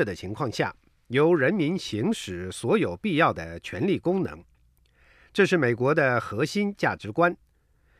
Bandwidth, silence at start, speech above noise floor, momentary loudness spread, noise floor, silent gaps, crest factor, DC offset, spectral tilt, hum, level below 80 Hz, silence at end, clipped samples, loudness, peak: 14.5 kHz; 0 s; 39 dB; 10 LU; -64 dBFS; none; 20 dB; under 0.1%; -6 dB/octave; none; -58 dBFS; 0.65 s; under 0.1%; -25 LUFS; -6 dBFS